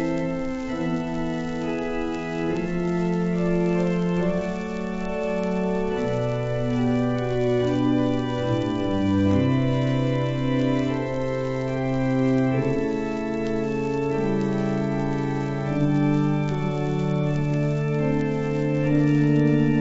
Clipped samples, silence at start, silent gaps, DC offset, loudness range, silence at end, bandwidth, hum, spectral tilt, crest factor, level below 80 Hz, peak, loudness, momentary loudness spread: under 0.1%; 0 s; none; under 0.1%; 3 LU; 0 s; 8 kHz; none; -8 dB/octave; 16 dB; -42 dBFS; -8 dBFS; -24 LUFS; 6 LU